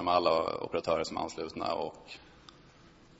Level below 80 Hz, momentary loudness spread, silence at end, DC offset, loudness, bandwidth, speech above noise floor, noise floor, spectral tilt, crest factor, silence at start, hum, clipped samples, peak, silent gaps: -62 dBFS; 21 LU; 0.95 s; under 0.1%; -32 LUFS; 8 kHz; 26 dB; -58 dBFS; -4.5 dB/octave; 22 dB; 0 s; none; under 0.1%; -12 dBFS; none